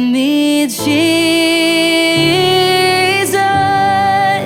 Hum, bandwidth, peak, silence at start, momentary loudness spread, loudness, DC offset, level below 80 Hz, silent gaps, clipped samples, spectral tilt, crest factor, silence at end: none; 17 kHz; -2 dBFS; 0 s; 2 LU; -11 LUFS; under 0.1%; -48 dBFS; none; under 0.1%; -3.5 dB/octave; 10 dB; 0 s